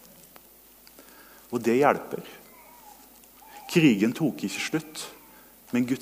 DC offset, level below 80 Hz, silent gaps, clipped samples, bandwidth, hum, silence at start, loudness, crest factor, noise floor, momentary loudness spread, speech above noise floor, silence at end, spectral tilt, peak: under 0.1%; -68 dBFS; none; under 0.1%; 16 kHz; none; 1 s; -26 LUFS; 22 dB; -54 dBFS; 26 LU; 29 dB; 0 s; -5.5 dB/octave; -6 dBFS